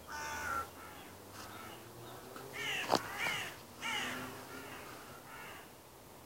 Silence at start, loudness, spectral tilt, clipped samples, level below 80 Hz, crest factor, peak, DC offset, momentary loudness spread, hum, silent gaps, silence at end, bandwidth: 0 s; -41 LUFS; -2.5 dB/octave; under 0.1%; -68 dBFS; 30 dB; -12 dBFS; under 0.1%; 15 LU; none; none; 0 s; 16 kHz